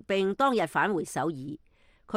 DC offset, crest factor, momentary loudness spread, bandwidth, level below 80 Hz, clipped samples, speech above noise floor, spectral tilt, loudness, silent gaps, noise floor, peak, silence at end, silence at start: under 0.1%; 16 dB; 16 LU; 16 kHz; -64 dBFS; under 0.1%; 21 dB; -5 dB/octave; -28 LUFS; none; -49 dBFS; -12 dBFS; 0 s; 0.1 s